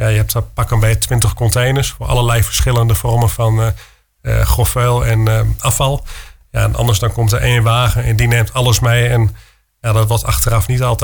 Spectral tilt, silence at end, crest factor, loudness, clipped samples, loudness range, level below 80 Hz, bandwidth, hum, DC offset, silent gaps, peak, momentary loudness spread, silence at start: -4.5 dB/octave; 0 s; 12 dB; -14 LUFS; under 0.1%; 1 LU; -24 dBFS; 19.5 kHz; none; under 0.1%; none; 0 dBFS; 5 LU; 0 s